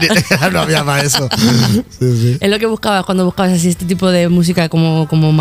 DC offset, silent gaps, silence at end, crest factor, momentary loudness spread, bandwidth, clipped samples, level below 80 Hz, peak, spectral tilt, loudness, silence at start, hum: under 0.1%; none; 0 s; 12 dB; 4 LU; 16 kHz; under 0.1%; -40 dBFS; 0 dBFS; -5 dB/octave; -13 LUFS; 0 s; none